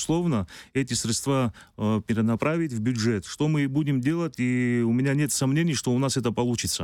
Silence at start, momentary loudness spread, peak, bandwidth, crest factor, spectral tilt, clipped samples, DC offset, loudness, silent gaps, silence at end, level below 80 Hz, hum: 0 s; 4 LU; -12 dBFS; 19 kHz; 14 dB; -5 dB/octave; under 0.1%; under 0.1%; -25 LUFS; none; 0 s; -54 dBFS; none